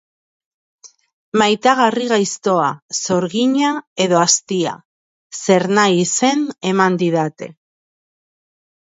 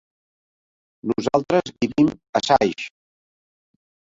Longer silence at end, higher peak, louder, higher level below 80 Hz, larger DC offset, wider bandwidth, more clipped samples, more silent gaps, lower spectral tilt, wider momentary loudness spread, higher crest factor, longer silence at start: about the same, 1.3 s vs 1.3 s; about the same, 0 dBFS vs -2 dBFS; first, -16 LUFS vs -21 LUFS; second, -66 dBFS vs -56 dBFS; neither; about the same, 8 kHz vs 7.8 kHz; neither; first, 1.13-1.32 s, 2.82-2.89 s, 3.87-3.96 s, 4.85-5.30 s vs 2.29-2.33 s; second, -3.5 dB/octave vs -5.5 dB/octave; second, 10 LU vs 13 LU; about the same, 18 dB vs 22 dB; second, 0.85 s vs 1.05 s